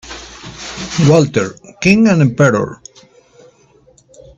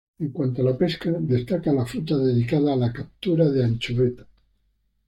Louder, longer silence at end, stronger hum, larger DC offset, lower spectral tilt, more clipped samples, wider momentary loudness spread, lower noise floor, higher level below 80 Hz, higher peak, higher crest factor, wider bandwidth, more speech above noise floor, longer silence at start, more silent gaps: first, -13 LUFS vs -23 LUFS; first, 1.65 s vs 0.85 s; neither; neither; second, -6 dB/octave vs -8.5 dB/octave; neither; first, 20 LU vs 6 LU; second, -49 dBFS vs -68 dBFS; first, -46 dBFS vs -52 dBFS; first, 0 dBFS vs -8 dBFS; about the same, 16 dB vs 16 dB; second, 8.4 kHz vs 12 kHz; second, 38 dB vs 46 dB; second, 0.05 s vs 0.2 s; neither